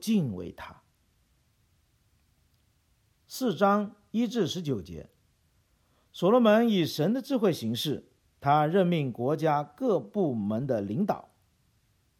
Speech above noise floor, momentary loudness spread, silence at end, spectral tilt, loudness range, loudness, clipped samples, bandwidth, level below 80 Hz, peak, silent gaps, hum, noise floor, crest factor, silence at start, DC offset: 42 dB; 15 LU; 1 s; -6.5 dB/octave; 7 LU; -27 LUFS; under 0.1%; 17 kHz; -66 dBFS; -10 dBFS; none; none; -69 dBFS; 18 dB; 0 s; under 0.1%